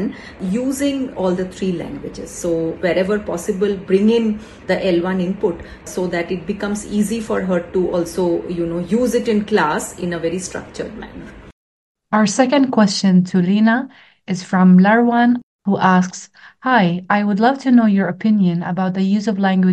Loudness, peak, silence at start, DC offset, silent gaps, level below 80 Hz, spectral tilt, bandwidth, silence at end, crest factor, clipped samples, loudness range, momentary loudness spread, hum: -17 LUFS; 0 dBFS; 0 s; under 0.1%; 11.53-11.95 s, 15.43-15.59 s; -48 dBFS; -6 dB/octave; 12.5 kHz; 0 s; 16 dB; under 0.1%; 6 LU; 13 LU; none